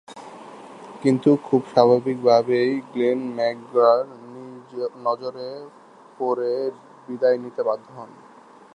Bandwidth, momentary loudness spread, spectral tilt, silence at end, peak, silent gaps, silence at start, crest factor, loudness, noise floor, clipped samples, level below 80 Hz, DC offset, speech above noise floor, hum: 10 kHz; 23 LU; -7 dB/octave; 0.7 s; -2 dBFS; none; 0.1 s; 22 dB; -21 LUFS; -48 dBFS; under 0.1%; -74 dBFS; under 0.1%; 27 dB; none